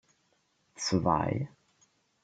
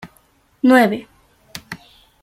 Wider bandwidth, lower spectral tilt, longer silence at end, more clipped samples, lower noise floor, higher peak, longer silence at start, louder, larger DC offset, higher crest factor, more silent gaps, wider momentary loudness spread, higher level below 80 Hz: second, 9.2 kHz vs 15.5 kHz; about the same, -5.5 dB/octave vs -5.5 dB/octave; first, 0.75 s vs 0.5 s; neither; first, -73 dBFS vs -57 dBFS; second, -12 dBFS vs -2 dBFS; first, 0.8 s vs 0.05 s; second, -31 LUFS vs -15 LUFS; neither; about the same, 22 dB vs 18 dB; neither; second, 9 LU vs 24 LU; about the same, -58 dBFS vs -58 dBFS